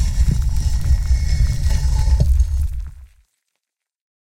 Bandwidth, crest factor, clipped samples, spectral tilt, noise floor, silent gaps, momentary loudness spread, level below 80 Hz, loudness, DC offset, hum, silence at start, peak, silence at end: 12.5 kHz; 14 dB; under 0.1%; -6 dB/octave; -80 dBFS; none; 7 LU; -18 dBFS; -20 LUFS; under 0.1%; none; 0 s; -2 dBFS; 1.2 s